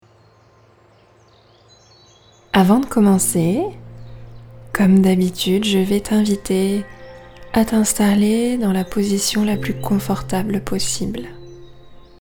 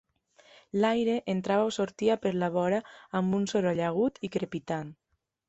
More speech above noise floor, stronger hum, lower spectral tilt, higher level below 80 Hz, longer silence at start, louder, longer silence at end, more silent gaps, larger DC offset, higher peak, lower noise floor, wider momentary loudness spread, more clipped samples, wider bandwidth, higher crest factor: about the same, 35 dB vs 33 dB; neither; second, -5 dB/octave vs -6.5 dB/octave; first, -42 dBFS vs -68 dBFS; first, 2.55 s vs 0.75 s; first, -18 LUFS vs -29 LUFS; second, 0.25 s vs 0.55 s; neither; neither; first, 0 dBFS vs -14 dBFS; second, -51 dBFS vs -61 dBFS; first, 13 LU vs 8 LU; neither; first, over 20 kHz vs 8.2 kHz; about the same, 18 dB vs 16 dB